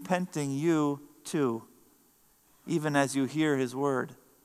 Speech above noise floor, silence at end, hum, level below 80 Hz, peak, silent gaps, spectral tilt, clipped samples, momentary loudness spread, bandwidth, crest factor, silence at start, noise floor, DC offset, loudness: 36 dB; 0.3 s; none; -76 dBFS; -10 dBFS; none; -5.5 dB/octave; under 0.1%; 11 LU; 15 kHz; 20 dB; 0 s; -65 dBFS; under 0.1%; -30 LUFS